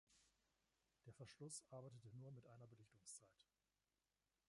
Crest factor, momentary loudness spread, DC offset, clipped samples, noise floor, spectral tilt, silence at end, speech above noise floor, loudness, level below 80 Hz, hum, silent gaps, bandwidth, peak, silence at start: 20 dB; 10 LU; under 0.1%; under 0.1%; under -90 dBFS; -4.5 dB/octave; 1.05 s; over 28 dB; -61 LUFS; -90 dBFS; none; none; 11 kHz; -44 dBFS; 0.1 s